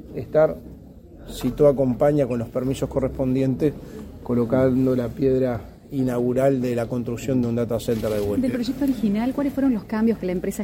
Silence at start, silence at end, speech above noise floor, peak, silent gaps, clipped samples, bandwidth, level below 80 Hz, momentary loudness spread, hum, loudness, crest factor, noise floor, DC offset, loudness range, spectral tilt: 0 s; 0 s; 21 dB; -6 dBFS; none; under 0.1%; 16.5 kHz; -44 dBFS; 8 LU; none; -22 LUFS; 16 dB; -43 dBFS; under 0.1%; 1 LU; -7.5 dB/octave